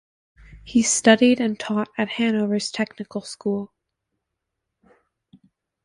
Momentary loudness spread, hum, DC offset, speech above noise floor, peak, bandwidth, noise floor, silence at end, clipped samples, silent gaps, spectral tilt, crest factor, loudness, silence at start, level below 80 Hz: 14 LU; none; under 0.1%; 60 dB; -2 dBFS; 11.5 kHz; -81 dBFS; 2.2 s; under 0.1%; none; -3.5 dB/octave; 22 dB; -21 LUFS; 0.5 s; -58 dBFS